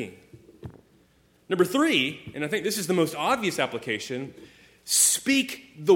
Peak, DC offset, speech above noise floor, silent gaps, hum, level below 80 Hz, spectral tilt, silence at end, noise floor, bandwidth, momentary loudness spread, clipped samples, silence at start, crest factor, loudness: -6 dBFS; under 0.1%; 37 dB; none; none; -64 dBFS; -2.5 dB/octave; 0 s; -62 dBFS; 18 kHz; 23 LU; under 0.1%; 0 s; 20 dB; -24 LUFS